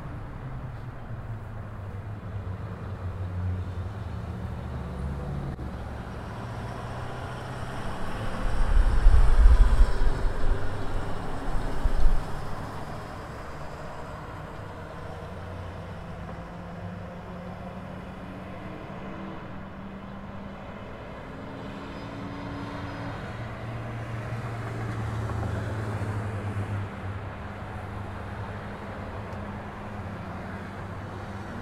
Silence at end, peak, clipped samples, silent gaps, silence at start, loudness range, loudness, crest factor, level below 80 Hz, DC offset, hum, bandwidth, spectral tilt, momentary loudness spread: 0 s; -4 dBFS; under 0.1%; none; 0 s; 13 LU; -33 LUFS; 22 dB; -30 dBFS; under 0.1%; none; 10 kHz; -7 dB/octave; 10 LU